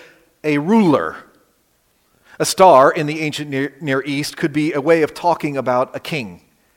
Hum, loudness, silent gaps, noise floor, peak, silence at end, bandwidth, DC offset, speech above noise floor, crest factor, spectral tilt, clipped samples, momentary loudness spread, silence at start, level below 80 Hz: none; -17 LUFS; none; -61 dBFS; 0 dBFS; 0.4 s; 17 kHz; under 0.1%; 45 dB; 18 dB; -5 dB/octave; under 0.1%; 14 LU; 0.45 s; -60 dBFS